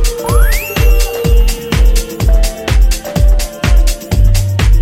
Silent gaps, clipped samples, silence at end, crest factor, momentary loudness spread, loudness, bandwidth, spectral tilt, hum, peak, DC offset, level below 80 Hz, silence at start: none; under 0.1%; 0 s; 8 dB; 2 LU; -13 LUFS; 16 kHz; -5 dB/octave; none; 0 dBFS; under 0.1%; -10 dBFS; 0 s